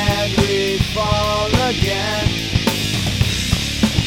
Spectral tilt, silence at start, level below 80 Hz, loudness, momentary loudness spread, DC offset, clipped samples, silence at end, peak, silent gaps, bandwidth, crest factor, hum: -4.5 dB/octave; 0 s; -28 dBFS; -18 LUFS; 2 LU; under 0.1%; under 0.1%; 0 s; 0 dBFS; none; over 20 kHz; 16 dB; none